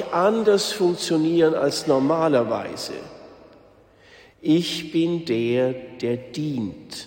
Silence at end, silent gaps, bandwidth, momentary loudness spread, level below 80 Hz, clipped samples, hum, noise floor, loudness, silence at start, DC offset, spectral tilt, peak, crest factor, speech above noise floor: 0 s; none; 16.5 kHz; 11 LU; -62 dBFS; under 0.1%; none; -52 dBFS; -22 LUFS; 0 s; under 0.1%; -5.5 dB/octave; -6 dBFS; 16 dB; 31 dB